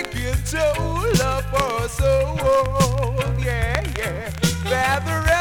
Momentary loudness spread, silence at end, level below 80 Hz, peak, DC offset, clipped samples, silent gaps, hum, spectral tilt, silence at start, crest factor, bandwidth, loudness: 5 LU; 0 s; -28 dBFS; -2 dBFS; under 0.1%; under 0.1%; none; none; -5 dB/octave; 0 s; 20 dB; 19 kHz; -21 LUFS